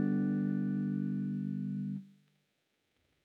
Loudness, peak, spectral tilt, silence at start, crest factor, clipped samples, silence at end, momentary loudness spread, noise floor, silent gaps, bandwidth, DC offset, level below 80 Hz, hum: -35 LUFS; -22 dBFS; -11 dB/octave; 0 s; 14 dB; under 0.1%; 1.15 s; 7 LU; -80 dBFS; none; 3.5 kHz; under 0.1%; -88 dBFS; none